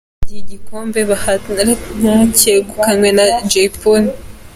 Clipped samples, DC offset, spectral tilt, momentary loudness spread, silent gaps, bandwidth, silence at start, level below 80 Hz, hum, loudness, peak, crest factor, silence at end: under 0.1%; under 0.1%; -3.5 dB/octave; 20 LU; none; 17 kHz; 0.2 s; -32 dBFS; none; -12 LUFS; 0 dBFS; 12 dB; 0.05 s